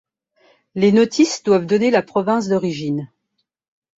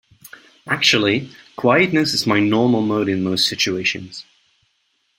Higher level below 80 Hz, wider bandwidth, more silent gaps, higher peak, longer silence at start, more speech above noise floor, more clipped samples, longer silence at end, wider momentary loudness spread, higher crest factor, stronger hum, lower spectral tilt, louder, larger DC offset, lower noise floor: about the same, -60 dBFS vs -58 dBFS; second, 8 kHz vs 16.5 kHz; neither; about the same, -2 dBFS vs -2 dBFS; first, 0.75 s vs 0.25 s; first, 57 dB vs 49 dB; neither; about the same, 0.9 s vs 1 s; about the same, 11 LU vs 11 LU; about the same, 16 dB vs 18 dB; neither; first, -5.5 dB/octave vs -4 dB/octave; about the same, -17 LUFS vs -17 LUFS; neither; first, -73 dBFS vs -67 dBFS